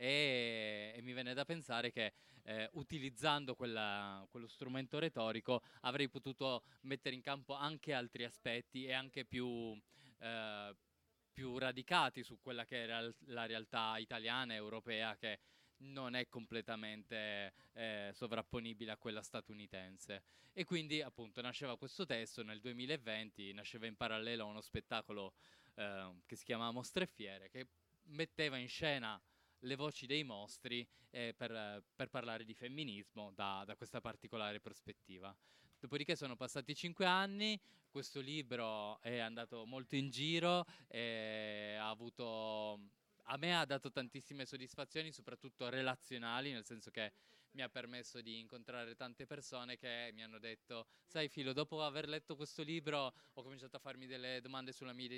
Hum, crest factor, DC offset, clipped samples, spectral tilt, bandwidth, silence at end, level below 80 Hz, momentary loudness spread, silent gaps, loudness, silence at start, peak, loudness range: none; 26 dB; under 0.1%; under 0.1%; -4.5 dB/octave; 16 kHz; 0 s; -78 dBFS; 12 LU; none; -44 LUFS; 0 s; -18 dBFS; 6 LU